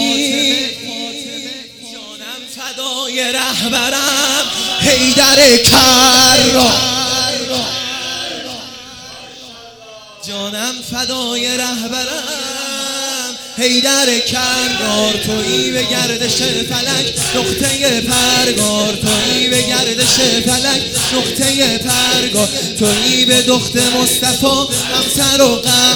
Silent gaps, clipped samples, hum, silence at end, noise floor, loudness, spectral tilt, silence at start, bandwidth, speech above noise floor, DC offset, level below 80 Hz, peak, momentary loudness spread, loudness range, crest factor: none; under 0.1%; none; 0 s; -36 dBFS; -12 LUFS; -2 dB/octave; 0 s; over 20 kHz; 23 dB; under 0.1%; -42 dBFS; 0 dBFS; 16 LU; 11 LU; 14 dB